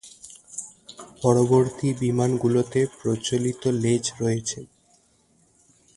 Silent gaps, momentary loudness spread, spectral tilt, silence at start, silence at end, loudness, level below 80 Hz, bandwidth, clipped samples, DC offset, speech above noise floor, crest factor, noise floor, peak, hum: none; 19 LU; -6 dB/octave; 0.05 s; 1.3 s; -23 LUFS; -58 dBFS; 11.5 kHz; under 0.1%; under 0.1%; 40 dB; 20 dB; -62 dBFS; -4 dBFS; none